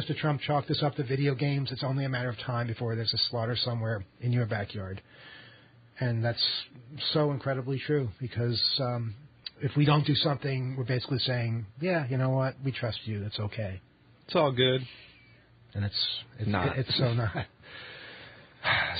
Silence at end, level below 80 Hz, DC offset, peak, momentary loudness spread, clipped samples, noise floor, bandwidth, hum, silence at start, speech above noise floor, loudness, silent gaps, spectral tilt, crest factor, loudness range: 0 s; -56 dBFS; under 0.1%; -10 dBFS; 17 LU; under 0.1%; -58 dBFS; 5 kHz; none; 0 s; 28 dB; -30 LUFS; none; -10 dB/octave; 20 dB; 3 LU